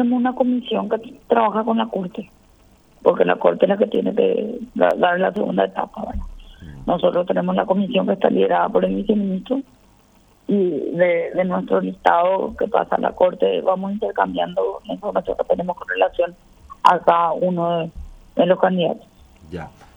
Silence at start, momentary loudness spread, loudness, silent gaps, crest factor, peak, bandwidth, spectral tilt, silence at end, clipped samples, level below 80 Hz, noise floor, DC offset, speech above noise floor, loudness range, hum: 0 s; 10 LU; -20 LUFS; none; 20 dB; 0 dBFS; 8.8 kHz; -7.5 dB/octave; 0.3 s; under 0.1%; -46 dBFS; -54 dBFS; under 0.1%; 35 dB; 2 LU; none